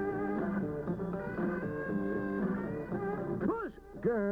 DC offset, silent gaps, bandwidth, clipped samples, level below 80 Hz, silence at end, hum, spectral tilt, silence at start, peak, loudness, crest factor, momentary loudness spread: under 0.1%; none; 5.2 kHz; under 0.1%; -56 dBFS; 0 s; none; -10 dB/octave; 0 s; -20 dBFS; -35 LUFS; 16 dB; 3 LU